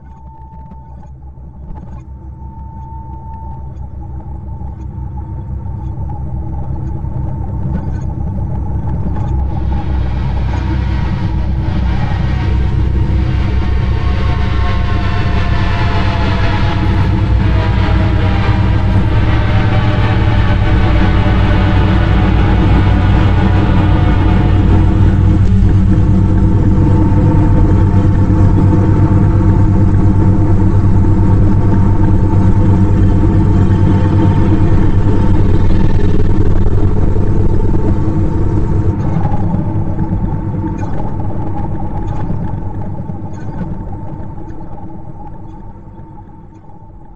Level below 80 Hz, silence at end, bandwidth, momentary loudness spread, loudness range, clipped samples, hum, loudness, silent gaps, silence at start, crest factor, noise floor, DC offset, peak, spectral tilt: -16 dBFS; 0 s; 6 kHz; 17 LU; 15 LU; under 0.1%; none; -13 LUFS; none; 0 s; 12 dB; -34 dBFS; 7%; 0 dBFS; -9 dB/octave